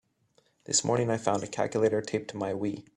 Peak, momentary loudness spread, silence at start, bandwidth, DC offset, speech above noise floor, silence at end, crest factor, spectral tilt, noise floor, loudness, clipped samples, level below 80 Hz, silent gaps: -12 dBFS; 8 LU; 0.7 s; 11.5 kHz; under 0.1%; 40 dB; 0.15 s; 20 dB; -4 dB/octave; -69 dBFS; -29 LUFS; under 0.1%; -68 dBFS; none